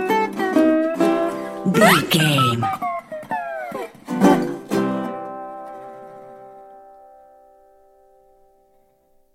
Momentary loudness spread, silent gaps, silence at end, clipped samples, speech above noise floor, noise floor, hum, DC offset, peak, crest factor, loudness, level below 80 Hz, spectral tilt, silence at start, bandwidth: 21 LU; none; 2.55 s; under 0.1%; 42 dB; -59 dBFS; none; under 0.1%; 0 dBFS; 22 dB; -19 LUFS; -62 dBFS; -5 dB/octave; 0 s; 16.5 kHz